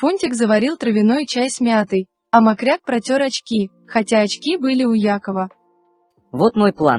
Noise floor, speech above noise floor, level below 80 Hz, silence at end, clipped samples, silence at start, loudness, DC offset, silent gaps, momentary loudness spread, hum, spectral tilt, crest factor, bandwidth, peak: -60 dBFS; 43 dB; -60 dBFS; 0 s; under 0.1%; 0 s; -17 LUFS; under 0.1%; none; 7 LU; none; -5 dB/octave; 18 dB; 11 kHz; 0 dBFS